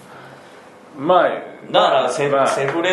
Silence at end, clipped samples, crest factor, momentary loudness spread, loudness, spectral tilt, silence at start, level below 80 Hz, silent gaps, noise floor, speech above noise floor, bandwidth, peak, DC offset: 0 s; under 0.1%; 16 dB; 7 LU; -17 LUFS; -4 dB/octave; 0.1 s; -68 dBFS; none; -42 dBFS; 25 dB; 12 kHz; -2 dBFS; under 0.1%